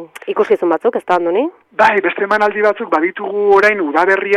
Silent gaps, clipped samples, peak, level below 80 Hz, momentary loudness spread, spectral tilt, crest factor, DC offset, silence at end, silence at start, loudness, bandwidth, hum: none; under 0.1%; -2 dBFS; -58 dBFS; 7 LU; -5 dB/octave; 12 dB; under 0.1%; 0 s; 0 s; -14 LUFS; 11.5 kHz; none